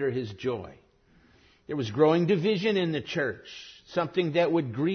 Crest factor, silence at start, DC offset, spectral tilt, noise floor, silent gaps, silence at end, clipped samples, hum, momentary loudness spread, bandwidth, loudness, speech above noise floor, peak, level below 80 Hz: 18 dB; 0 s; under 0.1%; -7 dB/octave; -61 dBFS; none; 0 s; under 0.1%; none; 15 LU; 6.6 kHz; -27 LUFS; 34 dB; -10 dBFS; -64 dBFS